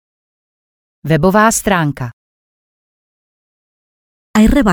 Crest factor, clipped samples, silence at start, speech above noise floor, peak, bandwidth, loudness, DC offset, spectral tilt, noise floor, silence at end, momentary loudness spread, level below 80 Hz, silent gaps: 16 dB; under 0.1%; 1.05 s; over 79 dB; 0 dBFS; 19.5 kHz; -13 LUFS; under 0.1%; -5 dB/octave; under -90 dBFS; 0 s; 16 LU; -30 dBFS; 2.13-4.34 s